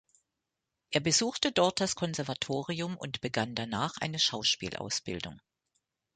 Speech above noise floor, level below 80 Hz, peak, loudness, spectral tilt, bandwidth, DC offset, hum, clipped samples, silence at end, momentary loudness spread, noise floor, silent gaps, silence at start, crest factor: 55 dB; -64 dBFS; -8 dBFS; -31 LUFS; -3 dB/octave; 9.6 kHz; under 0.1%; none; under 0.1%; 0.75 s; 9 LU; -87 dBFS; none; 0.9 s; 24 dB